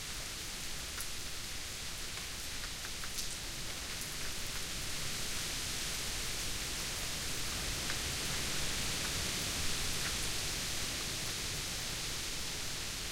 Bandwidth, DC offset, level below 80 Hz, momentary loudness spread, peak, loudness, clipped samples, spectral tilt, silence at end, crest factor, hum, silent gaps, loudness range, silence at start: 17 kHz; under 0.1%; -48 dBFS; 6 LU; -20 dBFS; -37 LUFS; under 0.1%; -1.5 dB/octave; 0 s; 18 dB; none; none; 5 LU; 0 s